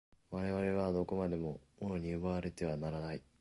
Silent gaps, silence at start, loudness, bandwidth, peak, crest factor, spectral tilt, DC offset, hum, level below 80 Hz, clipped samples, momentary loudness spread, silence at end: none; 0.3 s; -39 LUFS; 11.5 kHz; -22 dBFS; 16 dB; -8 dB/octave; under 0.1%; none; -56 dBFS; under 0.1%; 9 LU; 0.2 s